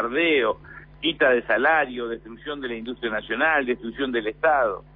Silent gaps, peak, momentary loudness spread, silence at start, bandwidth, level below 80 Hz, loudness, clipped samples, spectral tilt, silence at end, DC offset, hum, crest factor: none; -8 dBFS; 12 LU; 0 s; 4.8 kHz; -52 dBFS; -23 LUFS; under 0.1%; -7.5 dB/octave; 0.15 s; under 0.1%; none; 16 dB